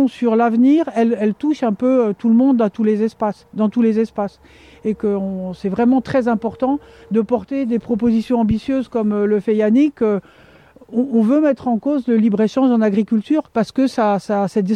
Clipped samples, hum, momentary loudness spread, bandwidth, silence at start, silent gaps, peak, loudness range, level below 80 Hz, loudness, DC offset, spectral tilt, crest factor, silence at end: under 0.1%; none; 8 LU; 9.4 kHz; 0 s; none; -4 dBFS; 3 LU; -50 dBFS; -17 LUFS; under 0.1%; -8 dB/octave; 12 dB; 0 s